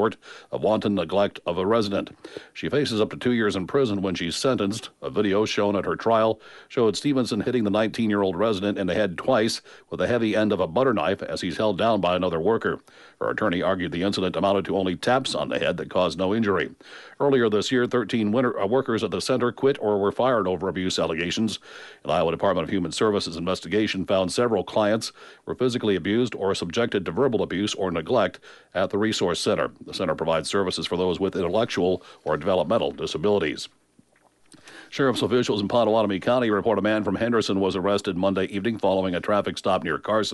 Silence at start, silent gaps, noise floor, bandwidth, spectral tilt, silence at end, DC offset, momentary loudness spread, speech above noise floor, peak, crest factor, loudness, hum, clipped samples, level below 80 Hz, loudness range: 0 s; none; -61 dBFS; 11.5 kHz; -5 dB/octave; 0 s; under 0.1%; 6 LU; 37 dB; -10 dBFS; 14 dB; -24 LUFS; none; under 0.1%; -56 dBFS; 2 LU